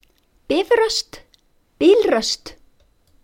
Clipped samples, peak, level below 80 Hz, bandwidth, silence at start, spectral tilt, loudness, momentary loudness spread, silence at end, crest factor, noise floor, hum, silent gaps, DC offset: under 0.1%; -4 dBFS; -52 dBFS; 16.5 kHz; 0.5 s; -2.5 dB/octave; -18 LUFS; 10 LU; 0.7 s; 18 dB; -58 dBFS; none; none; under 0.1%